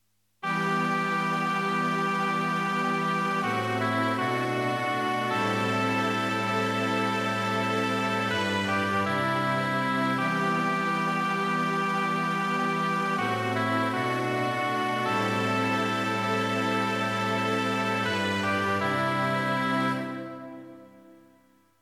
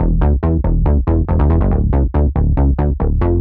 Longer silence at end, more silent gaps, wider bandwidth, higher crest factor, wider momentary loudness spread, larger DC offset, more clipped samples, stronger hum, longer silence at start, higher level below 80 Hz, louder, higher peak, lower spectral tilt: first, 0.65 s vs 0 s; neither; first, 16 kHz vs 3.1 kHz; about the same, 14 dB vs 10 dB; about the same, 1 LU vs 2 LU; neither; neither; neither; first, 0.45 s vs 0 s; second, -74 dBFS vs -16 dBFS; second, -26 LUFS vs -16 LUFS; second, -14 dBFS vs -4 dBFS; second, -5 dB/octave vs -13 dB/octave